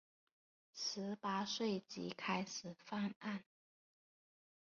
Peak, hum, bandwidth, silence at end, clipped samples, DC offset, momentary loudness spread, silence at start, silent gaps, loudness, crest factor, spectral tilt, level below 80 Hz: -26 dBFS; none; 7.2 kHz; 1.25 s; under 0.1%; under 0.1%; 8 LU; 0.75 s; 3.16-3.21 s; -43 LUFS; 20 dB; -3.5 dB/octave; -84 dBFS